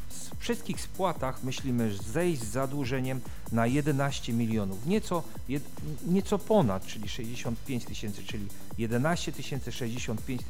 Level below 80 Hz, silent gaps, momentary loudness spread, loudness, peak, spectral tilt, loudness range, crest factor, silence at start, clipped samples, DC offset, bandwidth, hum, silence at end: -48 dBFS; none; 10 LU; -32 LUFS; -12 dBFS; -5.5 dB/octave; 4 LU; 18 dB; 0 s; under 0.1%; 2%; 18.5 kHz; none; 0 s